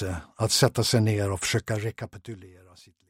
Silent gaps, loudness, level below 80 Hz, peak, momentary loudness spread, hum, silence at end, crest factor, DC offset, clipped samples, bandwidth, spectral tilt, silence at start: none; -25 LUFS; -52 dBFS; -6 dBFS; 19 LU; none; 0.6 s; 22 dB; under 0.1%; under 0.1%; 16.5 kHz; -4.5 dB/octave; 0 s